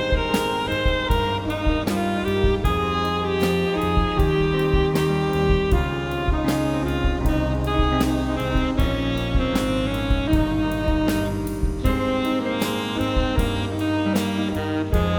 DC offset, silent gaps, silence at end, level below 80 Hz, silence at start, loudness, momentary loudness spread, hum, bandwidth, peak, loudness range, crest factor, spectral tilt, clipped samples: under 0.1%; none; 0 s; -26 dBFS; 0 s; -22 LUFS; 4 LU; none; over 20 kHz; -6 dBFS; 2 LU; 14 dB; -6.5 dB/octave; under 0.1%